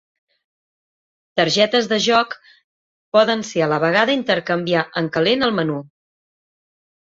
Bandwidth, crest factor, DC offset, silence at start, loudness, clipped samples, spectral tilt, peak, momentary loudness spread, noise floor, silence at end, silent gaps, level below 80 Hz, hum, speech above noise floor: 7.8 kHz; 20 dB; under 0.1%; 1.35 s; -18 LUFS; under 0.1%; -4.5 dB/octave; 0 dBFS; 8 LU; under -90 dBFS; 1.15 s; 2.64-3.12 s; -62 dBFS; none; over 72 dB